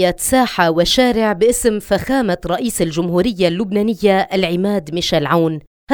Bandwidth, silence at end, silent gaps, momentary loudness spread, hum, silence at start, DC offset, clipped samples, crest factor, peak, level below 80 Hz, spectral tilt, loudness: over 20 kHz; 0 s; 5.67-5.87 s; 6 LU; none; 0 s; under 0.1%; under 0.1%; 16 dB; 0 dBFS; -38 dBFS; -4.5 dB/octave; -16 LUFS